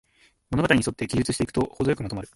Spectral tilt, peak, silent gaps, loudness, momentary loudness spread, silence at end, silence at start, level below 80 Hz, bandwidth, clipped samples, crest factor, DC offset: -5.5 dB/octave; -6 dBFS; none; -25 LUFS; 6 LU; 0.1 s; 0.5 s; -46 dBFS; 11.5 kHz; under 0.1%; 20 dB; under 0.1%